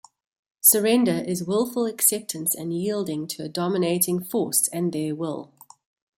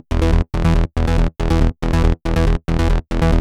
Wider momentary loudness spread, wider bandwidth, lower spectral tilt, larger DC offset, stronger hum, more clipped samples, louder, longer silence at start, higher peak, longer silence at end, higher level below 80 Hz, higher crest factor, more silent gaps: first, 12 LU vs 1 LU; first, 16.5 kHz vs 10.5 kHz; second, -4 dB/octave vs -7.5 dB/octave; neither; neither; neither; second, -22 LUFS vs -18 LUFS; first, 0.65 s vs 0.1 s; about the same, -4 dBFS vs -4 dBFS; first, 0.75 s vs 0 s; second, -70 dBFS vs -18 dBFS; first, 20 dB vs 12 dB; neither